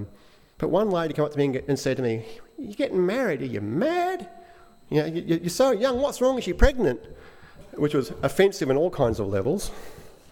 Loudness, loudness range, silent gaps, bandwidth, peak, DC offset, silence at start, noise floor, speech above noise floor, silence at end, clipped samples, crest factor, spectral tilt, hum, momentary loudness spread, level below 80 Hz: -25 LUFS; 3 LU; none; 17.5 kHz; -2 dBFS; under 0.1%; 0 s; -53 dBFS; 29 dB; 0.15 s; under 0.1%; 22 dB; -6 dB/octave; none; 14 LU; -36 dBFS